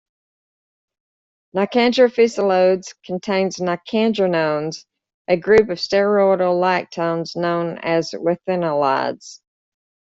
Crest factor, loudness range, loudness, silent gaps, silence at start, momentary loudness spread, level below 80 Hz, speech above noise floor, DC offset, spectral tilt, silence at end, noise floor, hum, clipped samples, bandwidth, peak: 16 dB; 2 LU; -18 LUFS; 5.14-5.25 s; 1.55 s; 10 LU; -58 dBFS; over 72 dB; under 0.1%; -5.5 dB/octave; 0.85 s; under -90 dBFS; none; under 0.1%; 7.8 kHz; -2 dBFS